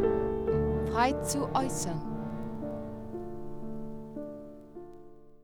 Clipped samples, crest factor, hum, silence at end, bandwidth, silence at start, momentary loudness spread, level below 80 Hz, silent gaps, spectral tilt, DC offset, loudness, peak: under 0.1%; 20 dB; none; 0 s; over 20 kHz; 0 s; 20 LU; -46 dBFS; none; -5.5 dB/octave; under 0.1%; -33 LUFS; -14 dBFS